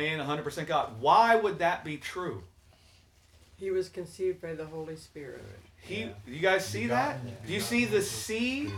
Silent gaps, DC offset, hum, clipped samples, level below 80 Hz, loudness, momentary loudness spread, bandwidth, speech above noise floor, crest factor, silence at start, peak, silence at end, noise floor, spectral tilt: none; under 0.1%; none; under 0.1%; -62 dBFS; -30 LUFS; 19 LU; 19 kHz; 30 dB; 20 dB; 0 s; -10 dBFS; 0 s; -60 dBFS; -4.5 dB/octave